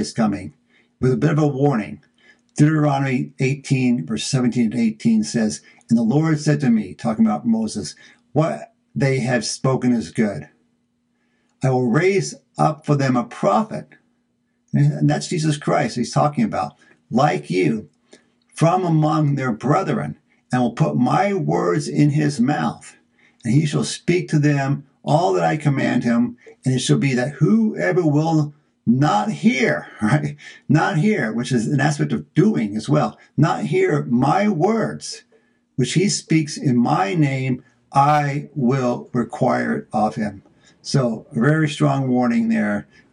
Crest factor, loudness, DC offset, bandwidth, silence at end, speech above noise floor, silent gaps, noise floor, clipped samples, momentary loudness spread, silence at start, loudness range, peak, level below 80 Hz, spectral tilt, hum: 16 dB; -20 LUFS; under 0.1%; 11 kHz; 0.3 s; 49 dB; none; -67 dBFS; under 0.1%; 8 LU; 0 s; 2 LU; -2 dBFS; -60 dBFS; -6.5 dB/octave; none